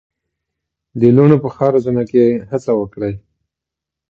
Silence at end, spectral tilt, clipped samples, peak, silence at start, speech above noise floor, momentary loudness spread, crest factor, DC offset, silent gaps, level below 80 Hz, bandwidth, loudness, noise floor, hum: 0.9 s; -10 dB/octave; under 0.1%; 0 dBFS; 0.95 s; 70 dB; 13 LU; 16 dB; under 0.1%; none; -50 dBFS; 7.6 kHz; -14 LUFS; -84 dBFS; none